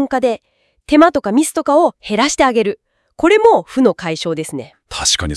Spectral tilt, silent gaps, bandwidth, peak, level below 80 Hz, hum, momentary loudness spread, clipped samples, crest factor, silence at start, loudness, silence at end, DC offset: -3.5 dB/octave; none; 12 kHz; 0 dBFS; -42 dBFS; none; 13 LU; 0.1%; 14 dB; 0 s; -14 LUFS; 0 s; under 0.1%